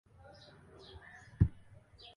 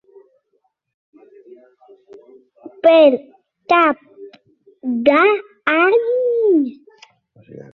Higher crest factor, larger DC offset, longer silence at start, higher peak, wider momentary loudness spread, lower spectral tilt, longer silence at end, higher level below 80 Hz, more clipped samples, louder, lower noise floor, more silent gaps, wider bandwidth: first, 26 dB vs 16 dB; neither; second, 1.4 s vs 2.65 s; second, -14 dBFS vs -2 dBFS; first, 24 LU vs 13 LU; first, -8.5 dB/octave vs -6 dB/octave; first, 0.65 s vs 0.15 s; first, -46 dBFS vs -66 dBFS; neither; second, -34 LUFS vs -15 LUFS; second, -58 dBFS vs -67 dBFS; neither; first, 10.5 kHz vs 6.2 kHz